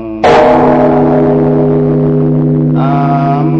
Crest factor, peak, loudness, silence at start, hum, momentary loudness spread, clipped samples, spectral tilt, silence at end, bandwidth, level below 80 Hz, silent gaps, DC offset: 8 dB; 0 dBFS; -9 LUFS; 0 s; none; 4 LU; under 0.1%; -9 dB/octave; 0 s; 7.6 kHz; -34 dBFS; none; under 0.1%